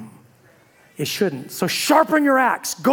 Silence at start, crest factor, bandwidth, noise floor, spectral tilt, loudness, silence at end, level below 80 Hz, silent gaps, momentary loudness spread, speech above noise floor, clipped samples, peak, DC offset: 0 s; 18 dB; 18 kHz; -53 dBFS; -3.5 dB/octave; -19 LUFS; 0 s; -70 dBFS; none; 10 LU; 35 dB; under 0.1%; -2 dBFS; under 0.1%